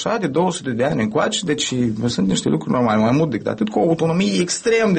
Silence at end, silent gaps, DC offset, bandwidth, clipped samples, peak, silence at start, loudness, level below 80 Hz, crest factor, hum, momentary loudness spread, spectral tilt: 0 s; none; under 0.1%; 8.8 kHz; under 0.1%; -6 dBFS; 0 s; -19 LUFS; -50 dBFS; 12 dB; none; 4 LU; -5 dB/octave